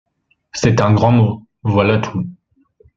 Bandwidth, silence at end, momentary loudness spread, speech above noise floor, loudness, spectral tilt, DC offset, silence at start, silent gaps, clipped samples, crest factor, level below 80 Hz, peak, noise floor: 7.6 kHz; 0.65 s; 13 LU; 40 dB; -15 LUFS; -7 dB/octave; under 0.1%; 0.55 s; none; under 0.1%; 16 dB; -46 dBFS; -2 dBFS; -54 dBFS